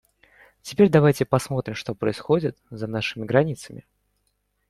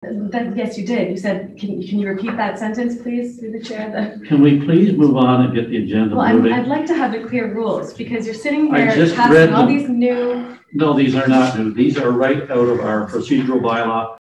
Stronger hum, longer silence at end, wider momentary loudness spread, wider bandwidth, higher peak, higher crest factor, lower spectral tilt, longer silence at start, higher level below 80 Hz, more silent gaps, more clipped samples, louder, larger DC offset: first, 50 Hz at -50 dBFS vs none; first, 0.9 s vs 0.05 s; first, 16 LU vs 12 LU; first, 14 kHz vs 9.6 kHz; about the same, -4 dBFS vs -2 dBFS; first, 20 dB vs 14 dB; about the same, -6.5 dB/octave vs -7.5 dB/octave; first, 0.65 s vs 0 s; about the same, -56 dBFS vs -56 dBFS; neither; neither; second, -22 LUFS vs -16 LUFS; neither